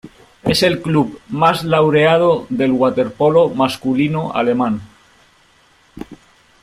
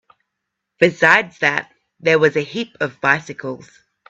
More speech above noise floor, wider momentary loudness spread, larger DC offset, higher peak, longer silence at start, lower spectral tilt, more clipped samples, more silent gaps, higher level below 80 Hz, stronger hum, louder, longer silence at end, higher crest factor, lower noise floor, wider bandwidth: second, 38 dB vs 61 dB; second, 11 LU vs 16 LU; neither; about the same, -2 dBFS vs 0 dBFS; second, 0.05 s vs 0.8 s; about the same, -6 dB/octave vs -5 dB/octave; neither; neither; first, -50 dBFS vs -62 dBFS; neither; about the same, -15 LUFS vs -17 LUFS; about the same, 0.45 s vs 0.5 s; about the same, 16 dB vs 20 dB; second, -52 dBFS vs -78 dBFS; first, 16 kHz vs 8.4 kHz